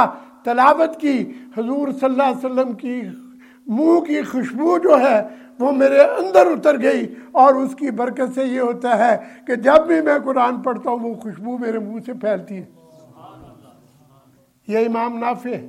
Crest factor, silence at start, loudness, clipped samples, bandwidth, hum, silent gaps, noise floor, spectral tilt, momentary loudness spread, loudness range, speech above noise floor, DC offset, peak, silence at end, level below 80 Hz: 18 dB; 0 s; -18 LUFS; under 0.1%; 12.5 kHz; none; none; -55 dBFS; -6 dB/octave; 14 LU; 11 LU; 37 dB; under 0.1%; 0 dBFS; 0 s; -62 dBFS